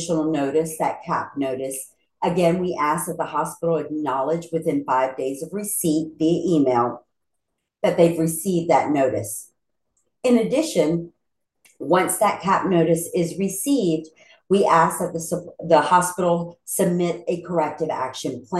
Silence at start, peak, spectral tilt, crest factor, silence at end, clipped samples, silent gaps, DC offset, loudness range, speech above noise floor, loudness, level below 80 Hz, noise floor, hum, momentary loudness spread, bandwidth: 0 s; -2 dBFS; -5.5 dB/octave; 20 dB; 0 s; under 0.1%; none; under 0.1%; 3 LU; 58 dB; -22 LUFS; -60 dBFS; -79 dBFS; none; 9 LU; 12.5 kHz